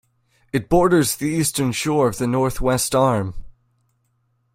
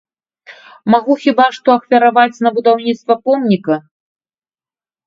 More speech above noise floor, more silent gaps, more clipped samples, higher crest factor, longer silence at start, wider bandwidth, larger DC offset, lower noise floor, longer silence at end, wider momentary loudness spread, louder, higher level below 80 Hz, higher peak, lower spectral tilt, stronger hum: second, 48 dB vs over 78 dB; neither; neither; about the same, 18 dB vs 14 dB; about the same, 0.55 s vs 0.5 s; first, 16.5 kHz vs 7.6 kHz; neither; second, -67 dBFS vs under -90 dBFS; second, 1.05 s vs 1.25 s; first, 8 LU vs 5 LU; second, -19 LUFS vs -13 LUFS; first, -38 dBFS vs -64 dBFS; second, -4 dBFS vs 0 dBFS; second, -5 dB/octave vs -6.5 dB/octave; neither